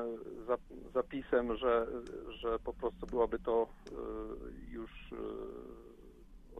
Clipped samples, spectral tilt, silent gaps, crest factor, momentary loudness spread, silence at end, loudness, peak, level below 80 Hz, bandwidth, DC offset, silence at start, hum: under 0.1%; -7 dB/octave; none; 20 dB; 15 LU; 0 s; -38 LUFS; -18 dBFS; -54 dBFS; 6.8 kHz; under 0.1%; 0 s; none